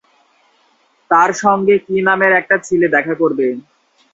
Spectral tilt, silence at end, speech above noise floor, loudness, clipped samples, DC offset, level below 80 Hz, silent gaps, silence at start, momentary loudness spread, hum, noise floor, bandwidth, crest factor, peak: -5.5 dB/octave; 0.55 s; 43 dB; -14 LUFS; under 0.1%; under 0.1%; -60 dBFS; none; 1.1 s; 6 LU; none; -57 dBFS; 8 kHz; 16 dB; 0 dBFS